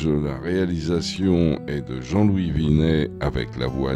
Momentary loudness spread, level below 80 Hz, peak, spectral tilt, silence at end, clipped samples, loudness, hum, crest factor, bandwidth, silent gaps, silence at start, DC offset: 7 LU; -36 dBFS; -6 dBFS; -7 dB/octave; 0 s; under 0.1%; -22 LUFS; none; 16 dB; 10.5 kHz; none; 0 s; under 0.1%